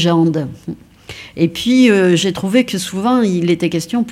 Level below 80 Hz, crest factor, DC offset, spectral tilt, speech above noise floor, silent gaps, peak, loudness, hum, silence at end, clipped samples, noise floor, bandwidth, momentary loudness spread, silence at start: -52 dBFS; 14 dB; under 0.1%; -5.5 dB/octave; 21 dB; none; 0 dBFS; -14 LUFS; none; 0 s; under 0.1%; -35 dBFS; 15 kHz; 20 LU; 0 s